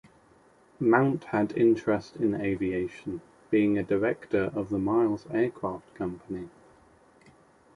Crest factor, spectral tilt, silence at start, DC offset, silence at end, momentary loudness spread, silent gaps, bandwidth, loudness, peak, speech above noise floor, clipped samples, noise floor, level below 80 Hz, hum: 20 dB; -8.5 dB/octave; 0.8 s; under 0.1%; 1.3 s; 14 LU; none; 10.5 kHz; -28 LUFS; -8 dBFS; 33 dB; under 0.1%; -60 dBFS; -58 dBFS; none